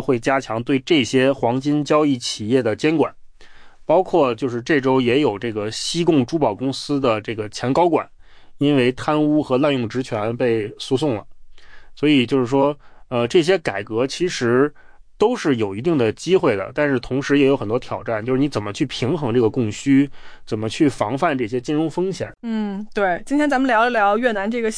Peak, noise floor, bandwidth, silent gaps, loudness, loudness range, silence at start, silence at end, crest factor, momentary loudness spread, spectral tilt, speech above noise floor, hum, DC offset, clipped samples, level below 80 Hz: -4 dBFS; -40 dBFS; 10.5 kHz; none; -19 LUFS; 2 LU; 0 s; 0 s; 14 dB; 8 LU; -5.5 dB/octave; 21 dB; none; under 0.1%; under 0.1%; -48 dBFS